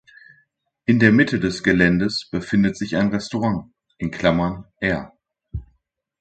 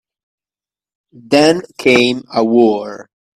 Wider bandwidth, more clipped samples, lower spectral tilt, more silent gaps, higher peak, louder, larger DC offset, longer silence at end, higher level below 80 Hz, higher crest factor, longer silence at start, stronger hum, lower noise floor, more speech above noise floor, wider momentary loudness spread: second, 9 kHz vs 13.5 kHz; neither; first, -6.5 dB/octave vs -4.5 dB/octave; neither; about the same, 0 dBFS vs 0 dBFS; second, -20 LUFS vs -13 LUFS; neither; first, 0.55 s vs 0.4 s; first, -44 dBFS vs -58 dBFS; about the same, 20 dB vs 16 dB; second, 0.9 s vs 1.3 s; neither; second, -68 dBFS vs under -90 dBFS; second, 49 dB vs over 77 dB; first, 14 LU vs 7 LU